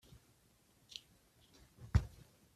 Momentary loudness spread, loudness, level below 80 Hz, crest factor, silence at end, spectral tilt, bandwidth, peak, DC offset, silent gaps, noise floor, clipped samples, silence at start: 25 LU; -41 LUFS; -48 dBFS; 28 dB; 0.45 s; -6 dB/octave; 14 kHz; -16 dBFS; under 0.1%; none; -71 dBFS; under 0.1%; 1.8 s